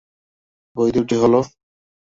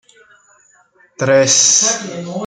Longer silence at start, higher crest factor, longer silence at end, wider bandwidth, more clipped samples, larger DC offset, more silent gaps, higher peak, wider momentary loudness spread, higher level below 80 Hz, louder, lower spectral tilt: second, 0.75 s vs 1.2 s; about the same, 18 dB vs 16 dB; first, 0.7 s vs 0 s; second, 7.8 kHz vs 10.5 kHz; neither; neither; neither; second, -4 dBFS vs 0 dBFS; about the same, 15 LU vs 13 LU; first, -54 dBFS vs -64 dBFS; second, -18 LUFS vs -11 LUFS; first, -7 dB/octave vs -1.5 dB/octave